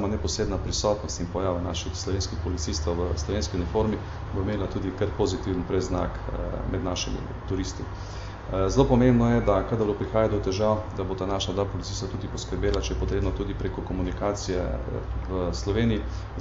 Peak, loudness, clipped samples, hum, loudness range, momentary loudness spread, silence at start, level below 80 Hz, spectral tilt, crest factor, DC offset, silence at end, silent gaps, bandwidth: -8 dBFS; -27 LUFS; under 0.1%; none; 5 LU; 9 LU; 0 s; -34 dBFS; -6 dB/octave; 18 dB; under 0.1%; 0 s; none; 8 kHz